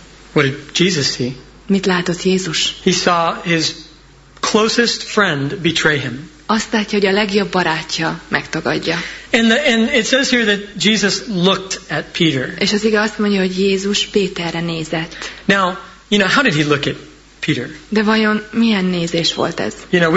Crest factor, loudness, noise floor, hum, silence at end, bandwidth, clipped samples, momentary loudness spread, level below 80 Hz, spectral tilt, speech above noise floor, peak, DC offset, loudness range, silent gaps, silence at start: 16 dB; -16 LUFS; -43 dBFS; none; 0 s; 8 kHz; under 0.1%; 9 LU; -46 dBFS; -4 dB/octave; 27 dB; 0 dBFS; under 0.1%; 2 LU; none; 0 s